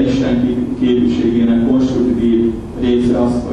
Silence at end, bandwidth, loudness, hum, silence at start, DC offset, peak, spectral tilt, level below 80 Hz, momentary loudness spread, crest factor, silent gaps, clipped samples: 0 s; 8.6 kHz; -14 LUFS; none; 0 s; under 0.1%; -2 dBFS; -7.5 dB/octave; -32 dBFS; 3 LU; 12 dB; none; under 0.1%